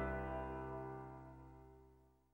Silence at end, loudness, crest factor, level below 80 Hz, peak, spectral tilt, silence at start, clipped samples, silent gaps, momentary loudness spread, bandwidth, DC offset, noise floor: 0.25 s; -48 LUFS; 16 dB; -56 dBFS; -32 dBFS; -9 dB/octave; 0 s; under 0.1%; none; 20 LU; 16 kHz; under 0.1%; -69 dBFS